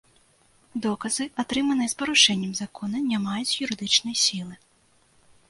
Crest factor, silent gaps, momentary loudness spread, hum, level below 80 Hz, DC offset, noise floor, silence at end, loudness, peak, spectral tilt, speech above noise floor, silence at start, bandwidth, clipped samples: 22 dB; none; 13 LU; none; -64 dBFS; under 0.1%; -62 dBFS; 0.95 s; -23 LUFS; -4 dBFS; -2 dB/octave; 37 dB; 0.75 s; 11.5 kHz; under 0.1%